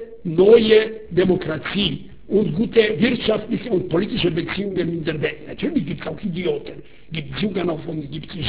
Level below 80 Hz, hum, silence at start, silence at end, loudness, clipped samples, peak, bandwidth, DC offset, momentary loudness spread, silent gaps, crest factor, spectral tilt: -46 dBFS; none; 0 s; 0 s; -20 LUFS; under 0.1%; -2 dBFS; 4 kHz; 0.8%; 13 LU; none; 18 dB; -10.5 dB/octave